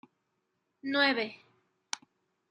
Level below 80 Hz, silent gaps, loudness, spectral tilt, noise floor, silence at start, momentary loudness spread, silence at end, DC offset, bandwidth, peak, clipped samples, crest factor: -88 dBFS; none; -31 LUFS; -2 dB/octave; -80 dBFS; 0.85 s; 14 LU; 0.55 s; under 0.1%; 11 kHz; -12 dBFS; under 0.1%; 24 dB